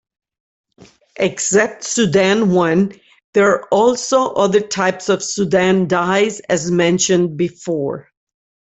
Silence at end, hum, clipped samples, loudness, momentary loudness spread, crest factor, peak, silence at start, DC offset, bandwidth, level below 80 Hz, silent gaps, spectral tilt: 0.8 s; none; under 0.1%; -16 LUFS; 7 LU; 14 dB; -2 dBFS; 1.2 s; under 0.1%; 8.4 kHz; -56 dBFS; 3.24-3.33 s; -4.5 dB/octave